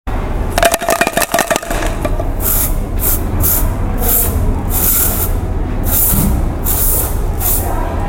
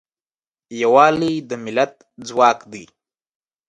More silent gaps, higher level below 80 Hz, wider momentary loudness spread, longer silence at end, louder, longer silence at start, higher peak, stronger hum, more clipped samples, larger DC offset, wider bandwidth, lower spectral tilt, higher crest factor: neither; first, -18 dBFS vs -62 dBFS; second, 8 LU vs 22 LU; second, 0 s vs 0.85 s; first, -14 LUFS vs -17 LUFS; second, 0.05 s vs 0.7 s; about the same, 0 dBFS vs 0 dBFS; neither; neither; neither; first, 17.5 kHz vs 11 kHz; about the same, -4 dB/octave vs -5 dB/octave; second, 14 dB vs 20 dB